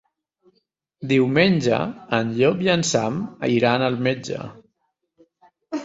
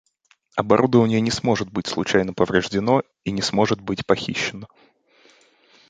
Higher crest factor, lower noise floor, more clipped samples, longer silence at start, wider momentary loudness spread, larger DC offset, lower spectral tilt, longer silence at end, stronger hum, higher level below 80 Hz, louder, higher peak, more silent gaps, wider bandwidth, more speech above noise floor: about the same, 20 dB vs 22 dB; first, -73 dBFS vs -62 dBFS; neither; first, 1 s vs 0.55 s; first, 14 LU vs 10 LU; neither; about the same, -5 dB/octave vs -5.5 dB/octave; second, 0 s vs 1.25 s; neither; second, -58 dBFS vs -52 dBFS; about the same, -20 LUFS vs -21 LUFS; about the same, -2 dBFS vs 0 dBFS; neither; second, 8 kHz vs 9.4 kHz; first, 53 dB vs 41 dB